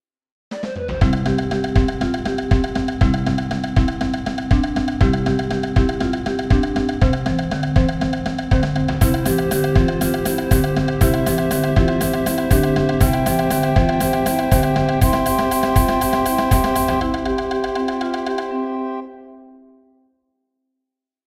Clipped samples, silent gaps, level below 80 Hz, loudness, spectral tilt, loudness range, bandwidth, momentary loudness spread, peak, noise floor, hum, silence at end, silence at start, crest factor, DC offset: under 0.1%; none; -24 dBFS; -19 LUFS; -6.5 dB/octave; 4 LU; 16.5 kHz; 6 LU; 0 dBFS; -82 dBFS; none; 1.85 s; 0.5 s; 18 dB; 0.1%